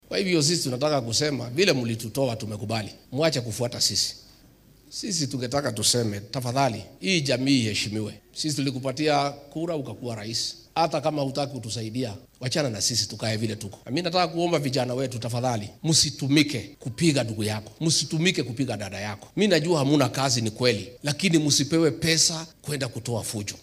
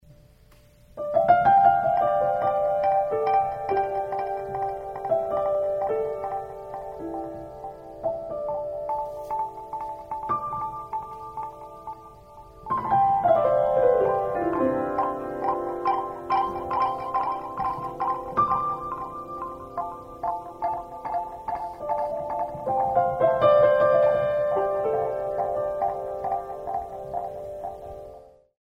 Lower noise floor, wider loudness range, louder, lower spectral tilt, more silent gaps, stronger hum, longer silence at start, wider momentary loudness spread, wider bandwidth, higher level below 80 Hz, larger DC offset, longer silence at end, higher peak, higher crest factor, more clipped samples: about the same, -54 dBFS vs -54 dBFS; second, 4 LU vs 10 LU; about the same, -25 LUFS vs -25 LUFS; second, -4 dB/octave vs -7.5 dB/octave; neither; neither; about the same, 0.1 s vs 0.1 s; second, 10 LU vs 15 LU; first, 16 kHz vs 14.5 kHz; second, -60 dBFS vs -54 dBFS; neither; second, 0 s vs 0.3 s; about the same, -6 dBFS vs -6 dBFS; about the same, 20 dB vs 20 dB; neither